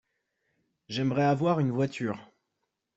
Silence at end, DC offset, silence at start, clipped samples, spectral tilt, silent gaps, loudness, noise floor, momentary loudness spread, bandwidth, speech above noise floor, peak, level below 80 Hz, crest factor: 0.7 s; under 0.1%; 0.9 s; under 0.1%; -7.5 dB/octave; none; -28 LUFS; -82 dBFS; 11 LU; 8 kHz; 55 dB; -12 dBFS; -70 dBFS; 18 dB